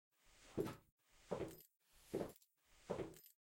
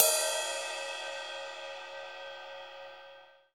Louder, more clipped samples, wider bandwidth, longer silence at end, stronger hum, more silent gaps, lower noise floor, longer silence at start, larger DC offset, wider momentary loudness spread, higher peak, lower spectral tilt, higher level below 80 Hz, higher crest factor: second, -50 LUFS vs -35 LUFS; neither; second, 16.5 kHz vs over 20 kHz; about the same, 0.1 s vs 0.2 s; second, none vs 60 Hz at -90 dBFS; first, 0.92-0.98 s vs none; first, -73 dBFS vs -55 dBFS; first, 0.25 s vs 0 s; neither; about the same, 19 LU vs 18 LU; second, -28 dBFS vs -4 dBFS; first, -6 dB/octave vs 2.5 dB/octave; first, -72 dBFS vs -86 dBFS; second, 22 dB vs 30 dB